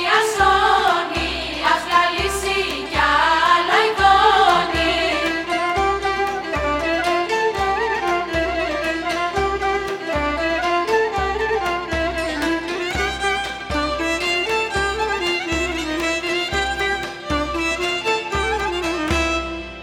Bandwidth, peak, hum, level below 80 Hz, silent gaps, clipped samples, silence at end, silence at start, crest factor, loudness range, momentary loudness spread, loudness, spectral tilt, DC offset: 16.5 kHz; -2 dBFS; none; -36 dBFS; none; under 0.1%; 0 s; 0 s; 18 dB; 5 LU; 7 LU; -19 LUFS; -3.5 dB/octave; under 0.1%